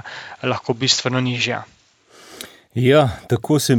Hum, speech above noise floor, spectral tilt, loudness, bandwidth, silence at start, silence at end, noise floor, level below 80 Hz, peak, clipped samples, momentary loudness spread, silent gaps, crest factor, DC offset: none; 32 dB; -4.5 dB/octave; -19 LUFS; 18.5 kHz; 0.05 s; 0 s; -50 dBFS; -52 dBFS; -2 dBFS; under 0.1%; 19 LU; none; 18 dB; under 0.1%